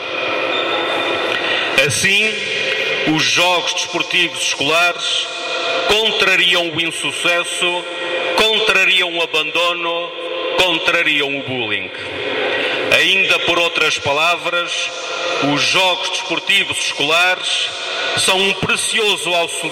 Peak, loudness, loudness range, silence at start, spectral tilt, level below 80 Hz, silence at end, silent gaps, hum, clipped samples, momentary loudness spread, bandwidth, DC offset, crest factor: 0 dBFS; -15 LUFS; 1 LU; 0 s; -1.5 dB/octave; -54 dBFS; 0 s; none; none; under 0.1%; 8 LU; 16.5 kHz; under 0.1%; 16 dB